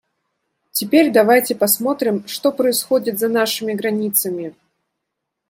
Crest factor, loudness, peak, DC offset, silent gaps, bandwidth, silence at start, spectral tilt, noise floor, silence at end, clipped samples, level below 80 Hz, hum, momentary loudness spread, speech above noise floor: 18 dB; -17 LUFS; -2 dBFS; under 0.1%; none; 16.5 kHz; 0.75 s; -3.5 dB/octave; -78 dBFS; 1 s; under 0.1%; -68 dBFS; none; 10 LU; 61 dB